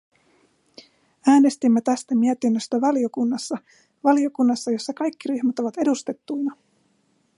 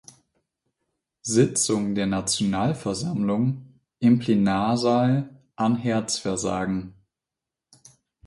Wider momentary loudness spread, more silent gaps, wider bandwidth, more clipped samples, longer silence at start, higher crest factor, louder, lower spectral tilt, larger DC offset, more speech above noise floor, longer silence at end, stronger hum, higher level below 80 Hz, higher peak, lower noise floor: about the same, 10 LU vs 8 LU; neither; about the same, 11.5 kHz vs 11.5 kHz; neither; about the same, 1.25 s vs 1.25 s; about the same, 18 dB vs 18 dB; about the same, -22 LUFS vs -23 LUFS; about the same, -5 dB/octave vs -5 dB/octave; neither; second, 44 dB vs 65 dB; second, 0.85 s vs 1.35 s; neither; second, -76 dBFS vs -56 dBFS; about the same, -6 dBFS vs -6 dBFS; second, -65 dBFS vs -88 dBFS